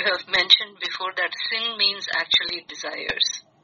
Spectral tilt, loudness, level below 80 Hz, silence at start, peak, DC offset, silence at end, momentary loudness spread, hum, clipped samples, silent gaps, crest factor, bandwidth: 3 dB/octave; -21 LUFS; -62 dBFS; 0 s; -2 dBFS; under 0.1%; 0.25 s; 12 LU; none; under 0.1%; none; 24 dB; 7.2 kHz